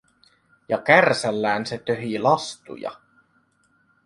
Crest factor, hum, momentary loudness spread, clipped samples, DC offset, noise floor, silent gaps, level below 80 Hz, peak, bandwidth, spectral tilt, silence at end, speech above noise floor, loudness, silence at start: 22 dB; none; 18 LU; under 0.1%; under 0.1%; -64 dBFS; none; -66 dBFS; -2 dBFS; 11.5 kHz; -4.5 dB/octave; 1.1 s; 43 dB; -21 LUFS; 0.7 s